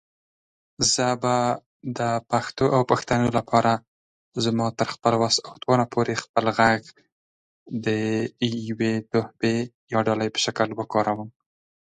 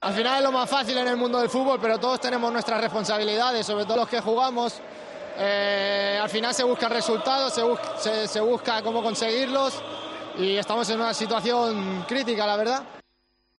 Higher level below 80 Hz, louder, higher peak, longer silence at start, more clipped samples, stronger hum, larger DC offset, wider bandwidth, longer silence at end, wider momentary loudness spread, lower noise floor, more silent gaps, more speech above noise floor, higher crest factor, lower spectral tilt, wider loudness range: first, -58 dBFS vs -70 dBFS; about the same, -23 LUFS vs -24 LUFS; first, -2 dBFS vs -8 dBFS; first, 0.8 s vs 0 s; neither; neither; neither; second, 9.6 kHz vs 11.5 kHz; about the same, 0.6 s vs 0.6 s; about the same, 7 LU vs 6 LU; first, under -90 dBFS vs -70 dBFS; first, 1.66-1.80 s, 3.88-4.32 s, 6.29-6.34 s, 7.12-7.66 s, 9.74-9.88 s vs none; first, over 67 dB vs 45 dB; first, 22 dB vs 16 dB; first, -4.5 dB/octave vs -3 dB/octave; about the same, 3 LU vs 2 LU